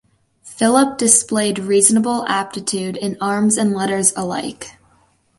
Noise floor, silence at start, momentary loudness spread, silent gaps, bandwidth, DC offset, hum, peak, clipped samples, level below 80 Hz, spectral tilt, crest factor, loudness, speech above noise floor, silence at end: -57 dBFS; 0.45 s; 11 LU; none; 12 kHz; under 0.1%; none; 0 dBFS; under 0.1%; -60 dBFS; -3 dB/octave; 18 dB; -16 LUFS; 40 dB; 0.7 s